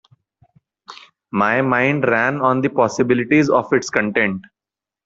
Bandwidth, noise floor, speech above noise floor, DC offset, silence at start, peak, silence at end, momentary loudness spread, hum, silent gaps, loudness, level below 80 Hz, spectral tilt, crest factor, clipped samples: 7.8 kHz; -88 dBFS; 72 dB; under 0.1%; 0.9 s; 0 dBFS; 0.65 s; 5 LU; none; none; -17 LUFS; -58 dBFS; -6 dB/octave; 18 dB; under 0.1%